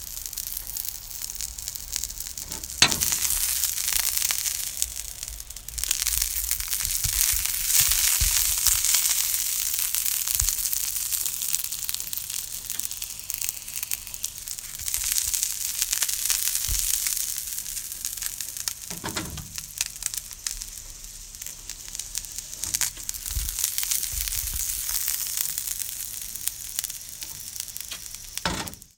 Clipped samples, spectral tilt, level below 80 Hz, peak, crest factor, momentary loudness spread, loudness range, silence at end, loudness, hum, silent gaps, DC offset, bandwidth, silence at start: under 0.1%; 0.5 dB/octave; -42 dBFS; 0 dBFS; 28 dB; 14 LU; 10 LU; 0.1 s; -25 LUFS; none; none; under 0.1%; 19 kHz; 0 s